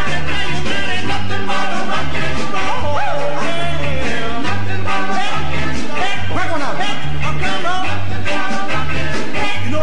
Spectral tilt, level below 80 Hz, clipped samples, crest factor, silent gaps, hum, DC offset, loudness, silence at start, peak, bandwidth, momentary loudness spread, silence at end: -4.5 dB/octave; -34 dBFS; under 0.1%; 12 dB; none; none; 30%; -20 LUFS; 0 s; -4 dBFS; 10.5 kHz; 2 LU; 0 s